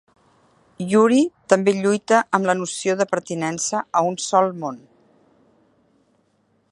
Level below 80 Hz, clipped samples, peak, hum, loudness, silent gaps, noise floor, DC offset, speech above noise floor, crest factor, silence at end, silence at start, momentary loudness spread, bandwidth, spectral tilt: -70 dBFS; under 0.1%; 0 dBFS; none; -20 LUFS; none; -64 dBFS; under 0.1%; 45 dB; 22 dB; 1.95 s; 0.8 s; 8 LU; 11.5 kHz; -4.5 dB/octave